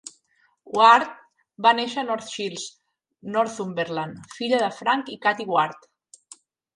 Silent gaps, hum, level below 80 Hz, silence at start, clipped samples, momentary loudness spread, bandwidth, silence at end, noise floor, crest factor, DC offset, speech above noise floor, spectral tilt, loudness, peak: none; none; -74 dBFS; 0.05 s; under 0.1%; 18 LU; 11 kHz; 1 s; -66 dBFS; 22 dB; under 0.1%; 43 dB; -3.5 dB/octave; -22 LUFS; -2 dBFS